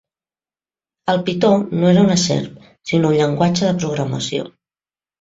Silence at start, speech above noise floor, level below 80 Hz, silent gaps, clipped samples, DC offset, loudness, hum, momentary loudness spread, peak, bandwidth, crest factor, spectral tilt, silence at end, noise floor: 1.05 s; over 74 dB; -54 dBFS; none; under 0.1%; under 0.1%; -17 LUFS; none; 13 LU; -2 dBFS; 7.8 kHz; 16 dB; -5.5 dB/octave; 0.7 s; under -90 dBFS